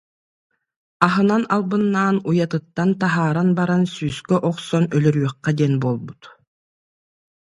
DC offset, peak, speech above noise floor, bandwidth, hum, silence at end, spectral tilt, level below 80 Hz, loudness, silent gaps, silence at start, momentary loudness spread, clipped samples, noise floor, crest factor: under 0.1%; 0 dBFS; over 71 dB; 11.5 kHz; none; 1.1 s; -7.5 dB/octave; -58 dBFS; -19 LUFS; none; 1 s; 5 LU; under 0.1%; under -90 dBFS; 20 dB